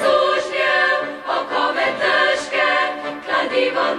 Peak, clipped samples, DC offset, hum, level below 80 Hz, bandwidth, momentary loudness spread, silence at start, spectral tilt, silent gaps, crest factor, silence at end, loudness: -4 dBFS; under 0.1%; under 0.1%; none; -60 dBFS; 11.5 kHz; 6 LU; 0 s; -2.5 dB/octave; none; 14 dB; 0 s; -18 LUFS